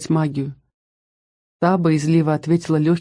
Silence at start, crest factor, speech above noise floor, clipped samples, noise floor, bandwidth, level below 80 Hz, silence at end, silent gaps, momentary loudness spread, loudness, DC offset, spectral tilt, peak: 0 s; 16 dB; over 72 dB; under 0.1%; under -90 dBFS; 10.5 kHz; -58 dBFS; 0 s; 0.74-1.60 s; 8 LU; -19 LUFS; under 0.1%; -7.5 dB/octave; -4 dBFS